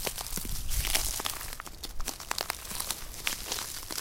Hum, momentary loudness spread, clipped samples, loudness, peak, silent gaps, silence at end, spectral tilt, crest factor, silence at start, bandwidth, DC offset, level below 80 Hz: none; 10 LU; under 0.1%; -33 LUFS; -6 dBFS; none; 0 s; -1 dB/octave; 28 dB; 0 s; 17 kHz; under 0.1%; -40 dBFS